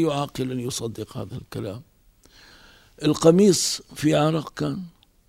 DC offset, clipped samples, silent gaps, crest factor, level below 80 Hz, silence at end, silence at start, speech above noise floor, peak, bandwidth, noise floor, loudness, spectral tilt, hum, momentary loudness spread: under 0.1%; under 0.1%; none; 20 dB; -56 dBFS; 0.4 s; 0 s; 33 dB; -4 dBFS; 16 kHz; -55 dBFS; -22 LUFS; -5 dB/octave; none; 18 LU